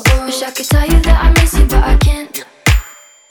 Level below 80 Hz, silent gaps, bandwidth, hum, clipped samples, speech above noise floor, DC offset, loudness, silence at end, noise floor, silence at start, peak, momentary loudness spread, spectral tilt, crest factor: -12 dBFS; none; 19.5 kHz; none; under 0.1%; 26 dB; under 0.1%; -13 LUFS; 0.4 s; -36 dBFS; 0 s; 0 dBFS; 8 LU; -4.5 dB/octave; 10 dB